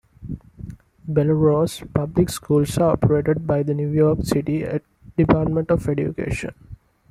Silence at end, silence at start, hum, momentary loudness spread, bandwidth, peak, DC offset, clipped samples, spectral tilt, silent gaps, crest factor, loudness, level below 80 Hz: 0.35 s; 0.2 s; none; 18 LU; 14 kHz; -2 dBFS; under 0.1%; under 0.1%; -7.5 dB/octave; none; 18 dB; -21 LUFS; -42 dBFS